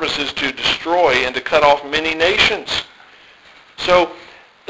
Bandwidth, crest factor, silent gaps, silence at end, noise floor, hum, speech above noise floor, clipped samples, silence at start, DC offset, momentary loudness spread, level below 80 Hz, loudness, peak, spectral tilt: 8 kHz; 18 dB; none; 0.45 s; -46 dBFS; none; 29 dB; under 0.1%; 0 s; under 0.1%; 9 LU; -46 dBFS; -16 LUFS; 0 dBFS; -3 dB/octave